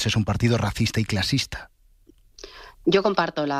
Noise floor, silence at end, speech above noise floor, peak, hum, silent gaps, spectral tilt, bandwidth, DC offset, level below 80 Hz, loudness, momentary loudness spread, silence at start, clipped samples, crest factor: -56 dBFS; 0 s; 33 dB; -6 dBFS; none; none; -5 dB/octave; 15 kHz; under 0.1%; -44 dBFS; -23 LUFS; 19 LU; 0 s; under 0.1%; 18 dB